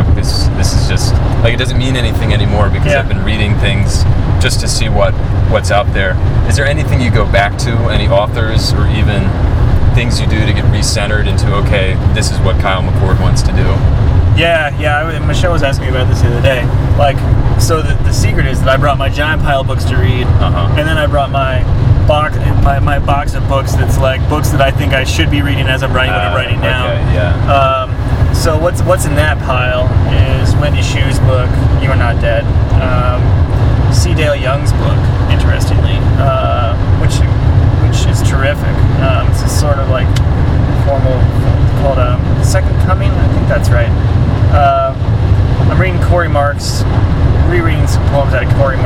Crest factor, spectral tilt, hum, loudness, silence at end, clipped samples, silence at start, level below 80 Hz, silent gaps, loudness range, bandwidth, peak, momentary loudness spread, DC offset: 10 dB; -6 dB/octave; none; -12 LUFS; 0 s; 0.2%; 0 s; -16 dBFS; none; 1 LU; 15 kHz; 0 dBFS; 2 LU; under 0.1%